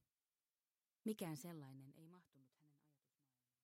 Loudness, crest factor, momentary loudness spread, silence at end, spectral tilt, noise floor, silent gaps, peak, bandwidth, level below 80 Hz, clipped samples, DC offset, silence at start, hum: -51 LUFS; 22 dB; 18 LU; 0.95 s; -5.5 dB/octave; under -90 dBFS; none; -34 dBFS; 16 kHz; under -90 dBFS; under 0.1%; under 0.1%; 1.05 s; none